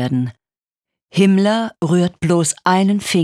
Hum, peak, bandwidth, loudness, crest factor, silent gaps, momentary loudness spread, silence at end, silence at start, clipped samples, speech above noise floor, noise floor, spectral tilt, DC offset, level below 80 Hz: none; -2 dBFS; 13.5 kHz; -16 LUFS; 16 dB; 0.58-0.62 s, 0.77-0.81 s; 8 LU; 0 s; 0 s; under 0.1%; over 75 dB; under -90 dBFS; -5.5 dB/octave; under 0.1%; -54 dBFS